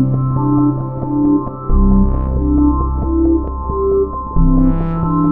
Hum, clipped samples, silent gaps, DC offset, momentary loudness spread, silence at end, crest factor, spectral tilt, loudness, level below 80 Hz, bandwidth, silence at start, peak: none; under 0.1%; none; under 0.1%; 5 LU; 0 s; 12 dB; -15 dB/octave; -16 LUFS; -18 dBFS; 2.6 kHz; 0 s; 0 dBFS